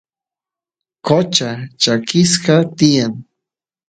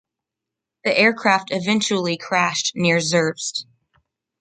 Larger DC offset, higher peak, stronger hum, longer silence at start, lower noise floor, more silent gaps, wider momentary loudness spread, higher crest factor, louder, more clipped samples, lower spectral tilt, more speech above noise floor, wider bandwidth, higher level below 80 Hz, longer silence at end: neither; about the same, 0 dBFS vs -2 dBFS; neither; first, 1.05 s vs 0.85 s; first, -89 dBFS vs -85 dBFS; neither; about the same, 11 LU vs 10 LU; about the same, 16 dB vs 20 dB; first, -14 LUFS vs -19 LUFS; neither; about the same, -4.5 dB/octave vs -3.5 dB/octave; first, 75 dB vs 65 dB; about the same, 9.4 kHz vs 9.4 kHz; first, -58 dBFS vs -66 dBFS; second, 0.65 s vs 0.8 s